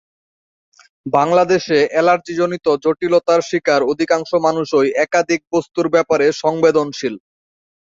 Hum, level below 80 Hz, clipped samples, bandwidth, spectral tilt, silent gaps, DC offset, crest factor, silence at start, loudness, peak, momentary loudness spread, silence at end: none; -60 dBFS; under 0.1%; 7.8 kHz; -5 dB/octave; none; under 0.1%; 16 dB; 1.05 s; -16 LUFS; -2 dBFS; 6 LU; 0.65 s